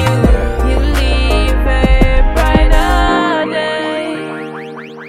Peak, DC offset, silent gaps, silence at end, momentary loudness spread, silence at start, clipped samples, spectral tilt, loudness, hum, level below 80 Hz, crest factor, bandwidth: 0 dBFS; under 0.1%; none; 0 s; 11 LU; 0 s; under 0.1%; -6 dB/octave; -13 LUFS; none; -14 dBFS; 12 dB; 13.5 kHz